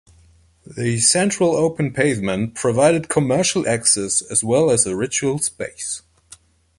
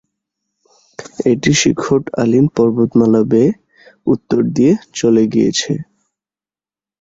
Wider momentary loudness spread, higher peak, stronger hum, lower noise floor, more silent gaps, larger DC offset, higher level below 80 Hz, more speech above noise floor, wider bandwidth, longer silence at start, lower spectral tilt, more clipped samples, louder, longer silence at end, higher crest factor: about the same, 10 LU vs 10 LU; about the same, -2 dBFS vs 0 dBFS; neither; second, -53 dBFS vs under -90 dBFS; neither; neither; about the same, -52 dBFS vs -50 dBFS; second, 34 dB vs over 77 dB; first, 11.5 kHz vs 8 kHz; second, 0.7 s vs 1 s; second, -3.5 dB/octave vs -5.5 dB/octave; neither; second, -18 LUFS vs -14 LUFS; second, 0.8 s vs 1.2 s; about the same, 18 dB vs 14 dB